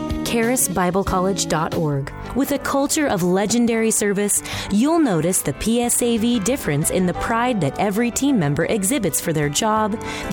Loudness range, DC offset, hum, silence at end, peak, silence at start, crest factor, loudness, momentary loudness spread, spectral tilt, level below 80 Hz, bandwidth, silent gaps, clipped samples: 1 LU; under 0.1%; none; 0 s; -6 dBFS; 0 s; 12 dB; -19 LUFS; 4 LU; -4.5 dB/octave; -40 dBFS; 19 kHz; none; under 0.1%